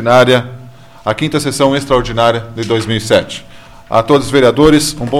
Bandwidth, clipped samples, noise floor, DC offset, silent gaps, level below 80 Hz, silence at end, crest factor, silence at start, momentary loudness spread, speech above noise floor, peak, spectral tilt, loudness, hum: 16 kHz; under 0.1%; -35 dBFS; 0.9%; none; -34 dBFS; 0 s; 12 dB; 0 s; 11 LU; 24 dB; 0 dBFS; -5 dB/octave; -12 LUFS; none